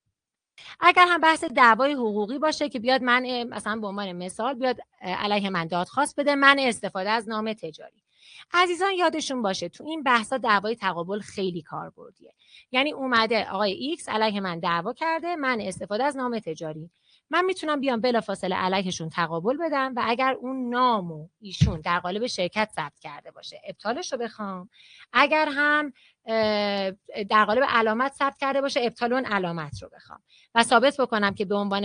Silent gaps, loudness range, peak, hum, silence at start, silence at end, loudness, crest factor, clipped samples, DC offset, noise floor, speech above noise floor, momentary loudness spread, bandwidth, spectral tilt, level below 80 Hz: none; 5 LU; 0 dBFS; none; 0.6 s; 0 s; -24 LUFS; 24 dB; under 0.1%; under 0.1%; -82 dBFS; 57 dB; 14 LU; 10.5 kHz; -4.5 dB/octave; -54 dBFS